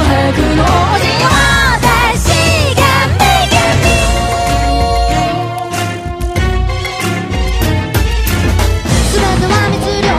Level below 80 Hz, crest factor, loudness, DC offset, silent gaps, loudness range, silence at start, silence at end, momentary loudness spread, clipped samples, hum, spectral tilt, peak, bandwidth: -18 dBFS; 12 dB; -12 LUFS; under 0.1%; none; 5 LU; 0 s; 0 s; 7 LU; 0.2%; none; -4.5 dB/octave; 0 dBFS; 16 kHz